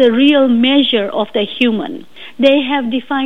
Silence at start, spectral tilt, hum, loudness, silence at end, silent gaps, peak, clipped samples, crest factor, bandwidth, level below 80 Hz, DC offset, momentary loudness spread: 0 s; -6 dB/octave; none; -13 LUFS; 0 s; none; 0 dBFS; under 0.1%; 12 dB; 6 kHz; -58 dBFS; 2%; 12 LU